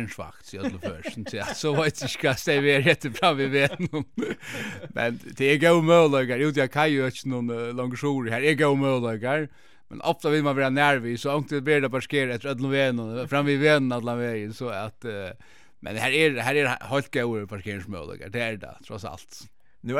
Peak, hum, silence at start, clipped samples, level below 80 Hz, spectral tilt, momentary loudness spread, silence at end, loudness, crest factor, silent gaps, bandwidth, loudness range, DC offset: -6 dBFS; none; 0 s; under 0.1%; -62 dBFS; -5.5 dB/octave; 15 LU; 0 s; -24 LUFS; 20 dB; none; 16 kHz; 4 LU; 0.3%